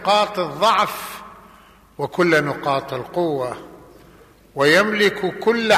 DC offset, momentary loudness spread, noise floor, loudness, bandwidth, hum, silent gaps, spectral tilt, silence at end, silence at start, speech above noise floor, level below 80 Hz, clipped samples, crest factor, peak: under 0.1%; 15 LU; -48 dBFS; -19 LUFS; 15 kHz; none; none; -4.5 dB/octave; 0 s; 0 s; 30 dB; -56 dBFS; under 0.1%; 16 dB; -4 dBFS